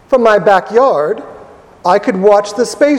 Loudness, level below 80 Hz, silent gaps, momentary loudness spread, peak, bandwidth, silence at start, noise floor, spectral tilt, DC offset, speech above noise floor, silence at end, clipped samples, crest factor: -11 LUFS; -50 dBFS; none; 9 LU; 0 dBFS; 13 kHz; 0.1 s; -37 dBFS; -5 dB/octave; under 0.1%; 27 dB; 0 s; 0.3%; 12 dB